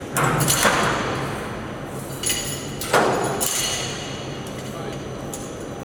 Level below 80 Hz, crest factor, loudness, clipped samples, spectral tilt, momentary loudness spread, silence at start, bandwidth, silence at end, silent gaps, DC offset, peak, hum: -44 dBFS; 20 dB; -23 LUFS; under 0.1%; -3 dB/octave; 13 LU; 0 s; 19.5 kHz; 0 s; none; under 0.1%; -4 dBFS; none